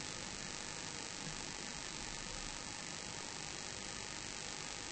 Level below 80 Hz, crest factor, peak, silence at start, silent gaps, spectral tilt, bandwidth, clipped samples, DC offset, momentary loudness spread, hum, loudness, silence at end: -60 dBFS; 22 dB; -24 dBFS; 0 s; none; -1.5 dB/octave; 8.8 kHz; under 0.1%; under 0.1%; 1 LU; none; -44 LUFS; 0 s